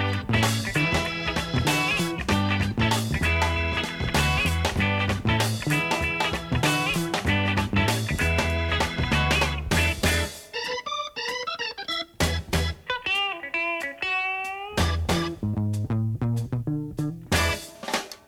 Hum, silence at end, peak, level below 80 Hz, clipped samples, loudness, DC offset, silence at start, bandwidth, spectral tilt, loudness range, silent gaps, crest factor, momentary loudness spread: none; 0.1 s; -8 dBFS; -36 dBFS; under 0.1%; -25 LUFS; under 0.1%; 0 s; 17 kHz; -4.5 dB/octave; 3 LU; none; 18 dB; 7 LU